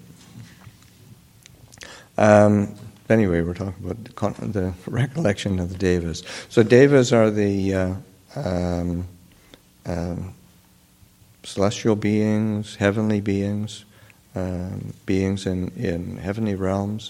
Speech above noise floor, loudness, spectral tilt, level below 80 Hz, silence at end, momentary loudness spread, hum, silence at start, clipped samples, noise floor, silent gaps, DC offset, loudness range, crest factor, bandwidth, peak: 34 dB; -22 LUFS; -6.5 dB/octave; -48 dBFS; 0 s; 18 LU; none; 0.35 s; under 0.1%; -55 dBFS; none; under 0.1%; 8 LU; 22 dB; 15 kHz; 0 dBFS